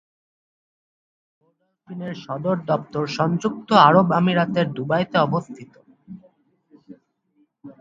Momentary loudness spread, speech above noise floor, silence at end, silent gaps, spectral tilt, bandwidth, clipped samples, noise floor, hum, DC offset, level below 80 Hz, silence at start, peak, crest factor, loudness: 19 LU; 45 dB; 0.1 s; none; -7 dB/octave; 7.6 kHz; under 0.1%; -65 dBFS; none; under 0.1%; -62 dBFS; 1.9 s; 0 dBFS; 22 dB; -20 LUFS